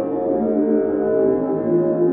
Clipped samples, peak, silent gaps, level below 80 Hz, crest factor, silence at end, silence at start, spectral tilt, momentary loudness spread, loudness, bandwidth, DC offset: under 0.1%; -6 dBFS; none; -52 dBFS; 12 dB; 0 s; 0 s; -11 dB/octave; 3 LU; -19 LUFS; 2.8 kHz; under 0.1%